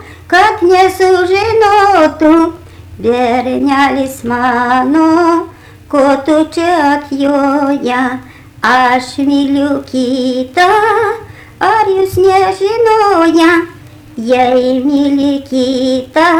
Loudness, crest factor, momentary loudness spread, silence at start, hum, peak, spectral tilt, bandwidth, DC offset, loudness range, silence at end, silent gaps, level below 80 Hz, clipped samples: -10 LUFS; 10 dB; 7 LU; 0 s; none; 0 dBFS; -5 dB/octave; 16 kHz; under 0.1%; 2 LU; 0 s; none; -44 dBFS; under 0.1%